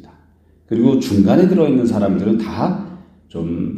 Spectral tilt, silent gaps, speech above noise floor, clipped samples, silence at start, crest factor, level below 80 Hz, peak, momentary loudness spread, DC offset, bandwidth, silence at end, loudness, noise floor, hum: -8 dB/octave; none; 37 dB; under 0.1%; 0.7 s; 16 dB; -48 dBFS; 0 dBFS; 14 LU; under 0.1%; 13.5 kHz; 0 s; -16 LUFS; -52 dBFS; none